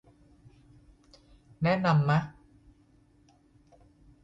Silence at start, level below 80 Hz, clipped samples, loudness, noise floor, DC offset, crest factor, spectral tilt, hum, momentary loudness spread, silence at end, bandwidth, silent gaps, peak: 1.6 s; -60 dBFS; under 0.1%; -27 LUFS; -63 dBFS; under 0.1%; 20 dB; -8 dB/octave; none; 8 LU; 1.9 s; 7.6 kHz; none; -12 dBFS